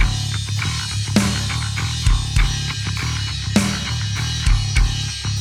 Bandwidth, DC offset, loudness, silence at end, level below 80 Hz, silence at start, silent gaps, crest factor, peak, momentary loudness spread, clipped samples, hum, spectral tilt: 14.5 kHz; under 0.1%; -21 LUFS; 0 s; -24 dBFS; 0 s; none; 18 dB; -2 dBFS; 4 LU; under 0.1%; none; -4 dB/octave